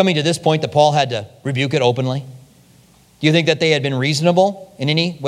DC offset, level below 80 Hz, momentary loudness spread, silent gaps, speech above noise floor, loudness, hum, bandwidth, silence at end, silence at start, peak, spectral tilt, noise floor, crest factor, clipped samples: under 0.1%; -62 dBFS; 9 LU; none; 34 dB; -17 LUFS; none; 13 kHz; 0 s; 0 s; 0 dBFS; -5.5 dB/octave; -50 dBFS; 18 dB; under 0.1%